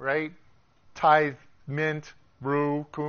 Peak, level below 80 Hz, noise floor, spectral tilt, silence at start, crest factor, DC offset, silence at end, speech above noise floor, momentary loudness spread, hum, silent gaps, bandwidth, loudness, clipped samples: -8 dBFS; -64 dBFS; -57 dBFS; -4.5 dB/octave; 0 s; 20 dB; under 0.1%; 0 s; 31 dB; 16 LU; none; none; 6.8 kHz; -26 LUFS; under 0.1%